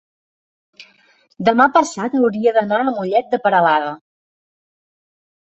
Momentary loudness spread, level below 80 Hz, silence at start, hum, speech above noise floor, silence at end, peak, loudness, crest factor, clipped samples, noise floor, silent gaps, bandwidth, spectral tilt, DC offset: 6 LU; -64 dBFS; 0.8 s; none; 39 dB; 1.45 s; -2 dBFS; -16 LUFS; 18 dB; under 0.1%; -55 dBFS; none; 8.2 kHz; -5 dB/octave; under 0.1%